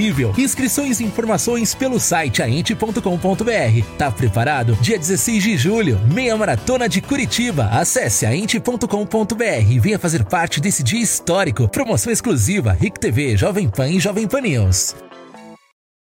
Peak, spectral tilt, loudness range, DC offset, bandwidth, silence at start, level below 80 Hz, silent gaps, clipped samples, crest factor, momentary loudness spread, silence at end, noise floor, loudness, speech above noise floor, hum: -6 dBFS; -4.5 dB/octave; 1 LU; under 0.1%; 17 kHz; 0 s; -40 dBFS; none; under 0.1%; 12 dB; 3 LU; 0.55 s; -40 dBFS; -17 LUFS; 23 dB; none